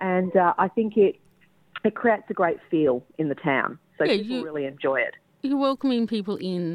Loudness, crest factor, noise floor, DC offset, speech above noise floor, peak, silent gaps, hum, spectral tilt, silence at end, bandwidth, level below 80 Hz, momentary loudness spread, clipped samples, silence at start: -24 LUFS; 18 dB; -61 dBFS; under 0.1%; 37 dB; -6 dBFS; none; none; -7.5 dB/octave; 0 s; 10.5 kHz; -68 dBFS; 8 LU; under 0.1%; 0 s